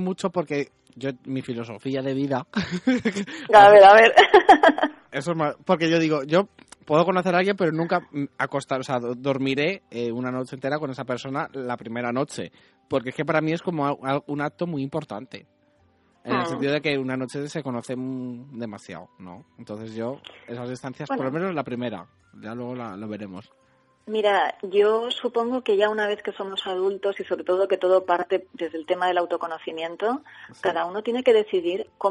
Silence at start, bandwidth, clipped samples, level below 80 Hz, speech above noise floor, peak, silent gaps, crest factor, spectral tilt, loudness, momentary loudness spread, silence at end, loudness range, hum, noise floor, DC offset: 0 s; 11.5 kHz; under 0.1%; -64 dBFS; 40 dB; -2 dBFS; none; 20 dB; -5.5 dB/octave; -22 LUFS; 15 LU; 0 s; 16 LU; none; -62 dBFS; under 0.1%